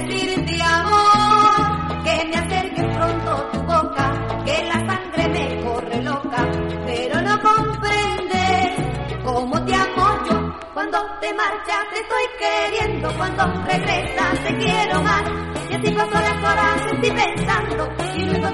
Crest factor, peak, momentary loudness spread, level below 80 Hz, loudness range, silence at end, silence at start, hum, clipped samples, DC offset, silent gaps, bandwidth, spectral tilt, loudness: 16 dB; -4 dBFS; 8 LU; -38 dBFS; 4 LU; 0 s; 0 s; none; under 0.1%; under 0.1%; none; 11.5 kHz; -5 dB/octave; -19 LUFS